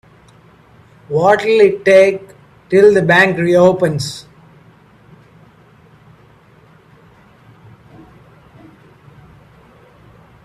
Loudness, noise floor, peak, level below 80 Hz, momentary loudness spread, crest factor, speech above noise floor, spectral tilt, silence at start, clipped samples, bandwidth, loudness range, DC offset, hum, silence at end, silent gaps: -12 LUFS; -47 dBFS; 0 dBFS; -54 dBFS; 13 LU; 16 dB; 36 dB; -6 dB/octave; 1.1 s; under 0.1%; 13 kHz; 9 LU; under 0.1%; none; 6.25 s; none